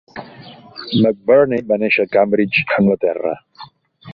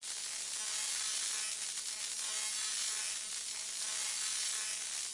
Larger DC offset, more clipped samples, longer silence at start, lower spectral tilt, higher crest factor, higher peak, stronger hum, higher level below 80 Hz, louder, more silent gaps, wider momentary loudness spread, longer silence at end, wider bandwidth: neither; neither; first, 0.15 s vs 0 s; first, -9 dB/octave vs 4 dB/octave; about the same, 16 dB vs 16 dB; first, -2 dBFS vs -22 dBFS; neither; first, -56 dBFS vs -80 dBFS; first, -16 LUFS vs -35 LUFS; neither; first, 19 LU vs 4 LU; about the same, 0 s vs 0 s; second, 5.6 kHz vs 11.5 kHz